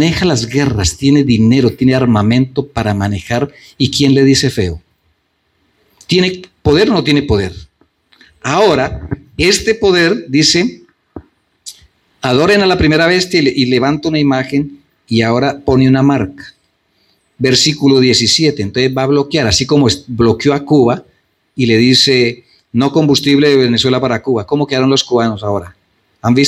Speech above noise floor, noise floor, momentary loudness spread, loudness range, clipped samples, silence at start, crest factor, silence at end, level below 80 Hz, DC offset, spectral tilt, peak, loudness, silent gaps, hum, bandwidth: 50 dB; -62 dBFS; 10 LU; 3 LU; under 0.1%; 0 s; 12 dB; 0 s; -38 dBFS; under 0.1%; -5 dB/octave; 0 dBFS; -12 LUFS; none; none; 13.5 kHz